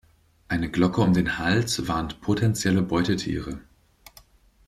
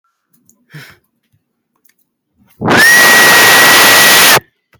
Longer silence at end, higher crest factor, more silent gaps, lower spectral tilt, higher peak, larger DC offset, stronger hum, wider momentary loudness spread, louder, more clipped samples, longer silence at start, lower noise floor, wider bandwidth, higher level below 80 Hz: first, 1.05 s vs 0.4 s; first, 18 dB vs 10 dB; neither; first, -5.5 dB/octave vs -0.5 dB/octave; second, -8 dBFS vs 0 dBFS; neither; neither; about the same, 9 LU vs 8 LU; second, -24 LUFS vs -3 LUFS; second, under 0.1% vs 0.4%; second, 0.5 s vs 0.75 s; second, -55 dBFS vs -63 dBFS; second, 14 kHz vs over 20 kHz; about the same, -46 dBFS vs -50 dBFS